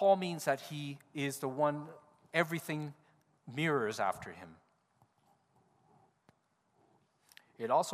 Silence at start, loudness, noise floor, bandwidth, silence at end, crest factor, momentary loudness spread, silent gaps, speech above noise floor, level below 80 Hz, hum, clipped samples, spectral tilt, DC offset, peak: 0 s; -36 LUFS; -75 dBFS; 15.5 kHz; 0 s; 24 dB; 14 LU; none; 41 dB; -80 dBFS; none; under 0.1%; -5 dB/octave; under 0.1%; -14 dBFS